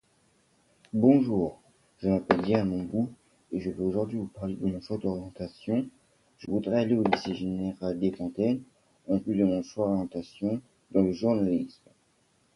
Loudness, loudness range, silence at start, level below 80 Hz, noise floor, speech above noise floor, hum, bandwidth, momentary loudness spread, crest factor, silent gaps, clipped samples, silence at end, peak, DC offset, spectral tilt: -29 LUFS; 5 LU; 0.95 s; -56 dBFS; -68 dBFS; 40 dB; none; 11 kHz; 10 LU; 26 dB; none; under 0.1%; 0.85 s; -4 dBFS; under 0.1%; -8 dB/octave